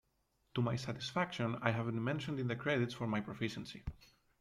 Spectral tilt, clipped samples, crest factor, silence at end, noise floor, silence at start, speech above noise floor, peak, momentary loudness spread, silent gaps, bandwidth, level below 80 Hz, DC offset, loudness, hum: -6.5 dB/octave; under 0.1%; 22 dB; 0.35 s; -79 dBFS; 0.55 s; 41 dB; -18 dBFS; 9 LU; none; 12 kHz; -60 dBFS; under 0.1%; -38 LUFS; none